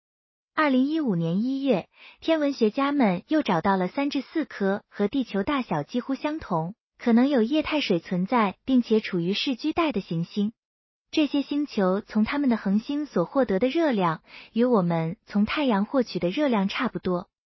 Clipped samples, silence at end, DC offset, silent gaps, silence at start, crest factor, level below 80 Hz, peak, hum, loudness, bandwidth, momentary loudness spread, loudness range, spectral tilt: under 0.1%; 0.35 s; under 0.1%; 6.81-6.90 s, 10.58-11.05 s; 0.55 s; 16 dB; -58 dBFS; -10 dBFS; none; -25 LUFS; 6.2 kHz; 7 LU; 2 LU; -7 dB/octave